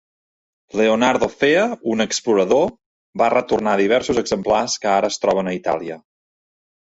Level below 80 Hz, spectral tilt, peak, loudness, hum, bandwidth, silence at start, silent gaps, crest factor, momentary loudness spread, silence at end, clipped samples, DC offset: -54 dBFS; -4 dB/octave; -2 dBFS; -18 LUFS; none; 8 kHz; 0.75 s; 2.86-3.13 s; 16 dB; 7 LU; 0.95 s; under 0.1%; under 0.1%